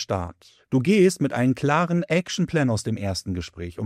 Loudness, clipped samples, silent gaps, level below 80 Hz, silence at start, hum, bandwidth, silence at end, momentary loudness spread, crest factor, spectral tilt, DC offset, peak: -23 LUFS; under 0.1%; none; -54 dBFS; 0 s; none; 14.5 kHz; 0 s; 12 LU; 16 dB; -6 dB/octave; under 0.1%; -6 dBFS